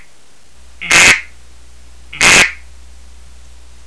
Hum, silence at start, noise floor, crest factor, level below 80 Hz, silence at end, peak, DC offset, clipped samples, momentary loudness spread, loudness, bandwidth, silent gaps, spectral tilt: none; 0.8 s; -48 dBFS; 16 dB; -38 dBFS; 1.3 s; 0 dBFS; 2%; 0.4%; 8 LU; -8 LUFS; 11 kHz; none; -0.5 dB/octave